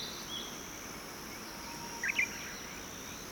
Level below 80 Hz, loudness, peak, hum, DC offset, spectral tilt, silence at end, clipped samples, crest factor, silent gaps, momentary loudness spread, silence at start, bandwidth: -60 dBFS; -38 LUFS; -20 dBFS; none; under 0.1%; -1.5 dB/octave; 0 s; under 0.1%; 22 dB; none; 11 LU; 0 s; over 20 kHz